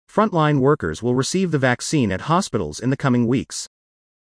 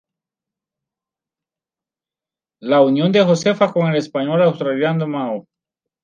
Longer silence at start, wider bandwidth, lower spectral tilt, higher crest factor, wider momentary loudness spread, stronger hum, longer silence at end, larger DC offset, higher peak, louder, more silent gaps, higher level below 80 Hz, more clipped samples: second, 0.15 s vs 2.6 s; first, 10.5 kHz vs 9.4 kHz; about the same, -5.5 dB/octave vs -6.5 dB/octave; about the same, 16 dB vs 18 dB; second, 7 LU vs 10 LU; neither; about the same, 0.65 s vs 0.65 s; neither; second, -4 dBFS vs 0 dBFS; second, -20 LUFS vs -17 LUFS; neither; first, -50 dBFS vs -68 dBFS; neither